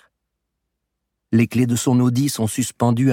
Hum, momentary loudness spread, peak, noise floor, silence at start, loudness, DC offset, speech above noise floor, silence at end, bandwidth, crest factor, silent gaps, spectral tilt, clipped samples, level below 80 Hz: none; 4 LU; -4 dBFS; -78 dBFS; 1.3 s; -19 LUFS; under 0.1%; 60 dB; 0 s; 17 kHz; 16 dB; none; -6 dB/octave; under 0.1%; -60 dBFS